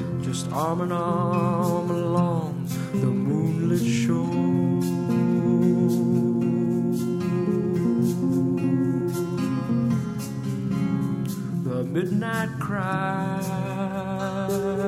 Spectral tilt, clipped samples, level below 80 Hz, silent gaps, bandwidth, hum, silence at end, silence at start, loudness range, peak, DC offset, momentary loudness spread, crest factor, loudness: -7.5 dB/octave; under 0.1%; -58 dBFS; none; 15.5 kHz; none; 0 s; 0 s; 4 LU; -10 dBFS; under 0.1%; 6 LU; 14 dB; -24 LUFS